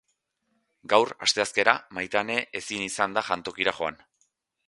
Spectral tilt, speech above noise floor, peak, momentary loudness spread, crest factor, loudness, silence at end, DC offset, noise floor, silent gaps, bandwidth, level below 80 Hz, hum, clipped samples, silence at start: -2 dB/octave; 49 dB; 0 dBFS; 9 LU; 28 dB; -26 LUFS; 0.75 s; under 0.1%; -76 dBFS; none; 11.5 kHz; -66 dBFS; none; under 0.1%; 0.85 s